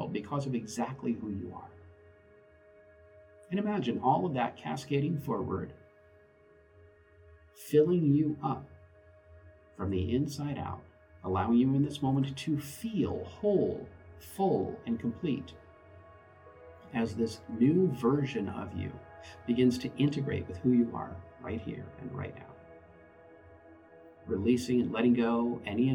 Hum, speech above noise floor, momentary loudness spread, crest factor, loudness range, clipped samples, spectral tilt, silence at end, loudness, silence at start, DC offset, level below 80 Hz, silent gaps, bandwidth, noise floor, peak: none; 30 dB; 17 LU; 20 dB; 7 LU; under 0.1%; -7.5 dB/octave; 0 s; -31 LUFS; 0 s; under 0.1%; -60 dBFS; none; 19.5 kHz; -61 dBFS; -14 dBFS